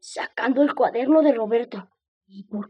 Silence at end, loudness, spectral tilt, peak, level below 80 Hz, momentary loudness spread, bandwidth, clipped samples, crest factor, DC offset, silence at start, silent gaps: 0.05 s; -21 LUFS; -5.5 dB/octave; -6 dBFS; -78 dBFS; 17 LU; 9.8 kHz; under 0.1%; 18 dB; under 0.1%; 0.05 s; 2.08-2.21 s